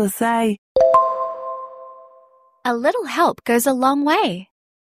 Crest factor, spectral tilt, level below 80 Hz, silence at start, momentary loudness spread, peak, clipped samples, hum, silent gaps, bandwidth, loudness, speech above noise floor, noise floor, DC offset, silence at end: 16 dB; -4 dB/octave; -58 dBFS; 0 s; 16 LU; -4 dBFS; under 0.1%; none; 0.58-0.75 s; 15.5 kHz; -18 LUFS; 34 dB; -52 dBFS; under 0.1%; 0.5 s